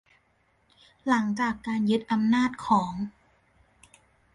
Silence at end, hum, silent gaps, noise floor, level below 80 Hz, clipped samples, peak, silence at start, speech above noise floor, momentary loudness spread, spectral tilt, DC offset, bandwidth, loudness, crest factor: 1.25 s; none; none; -68 dBFS; -62 dBFS; under 0.1%; -8 dBFS; 1.05 s; 42 dB; 11 LU; -6 dB/octave; under 0.1%; 11 kHz; -26 LUFS; 20 dB